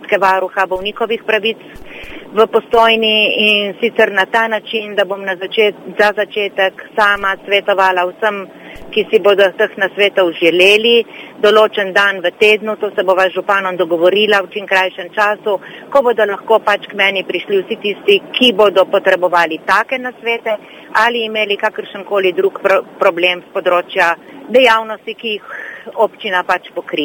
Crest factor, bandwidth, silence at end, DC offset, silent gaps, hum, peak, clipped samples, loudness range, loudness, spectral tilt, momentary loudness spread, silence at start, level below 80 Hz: 14 dB; 18 kHz; 0 s; under 0.1%; none; none; 0 dBFS; 0.1%; 4 LU; -13 LUFS; -3.5 dB/octave; 10 LU; 0 s; -52 dBFS